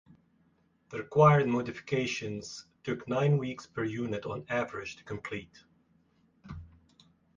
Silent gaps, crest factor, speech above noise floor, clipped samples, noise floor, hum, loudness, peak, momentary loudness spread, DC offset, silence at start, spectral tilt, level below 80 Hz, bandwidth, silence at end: none; 22 dB; 39 dB; under 0.1%; -69 dBFS; none; -31 LUFS; -10 dBFS; 19 LU; under 0.1%; 0.9 s; -6.5 dB/octave; -62 dBFS; 7.6 kHz; 0.7 s